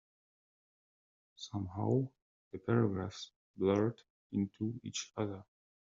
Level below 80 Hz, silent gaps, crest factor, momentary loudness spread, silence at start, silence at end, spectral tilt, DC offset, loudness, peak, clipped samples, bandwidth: -72 dBFS; 2.22-2.51 s, 3.36-3.54 s, 4.10-4.30 s; 20 dB; 18 LU; 1.4 s; 0.4 s; -7 dB/octave; under 0.1%; -37 LUFS; -18 dBFS; under 0.1%; 7.4 kHz